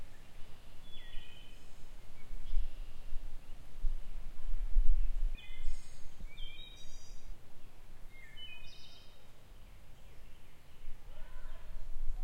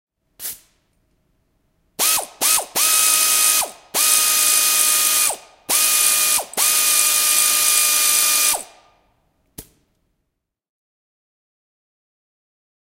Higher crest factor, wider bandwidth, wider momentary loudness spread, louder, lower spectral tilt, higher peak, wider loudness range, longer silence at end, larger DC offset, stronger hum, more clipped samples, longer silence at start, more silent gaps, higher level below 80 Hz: about the same, 20 dB vs 20 dB; second, 5.2 kHz vs 16 kHz; first, 18 LU vs 7 LU; second, -48 LUFS vs -14 LUFS; first, -4.5 dB/octave vs 3 dB/octave; second, -12 dBFS vs 0 dBFS; first, 12 LU vs 5 LU; second, 0 s vs 3.3 s; neither; neither; neither; second, 0 s vs 0.4 s; neither; first, -38 dBFS vs -62 dBFS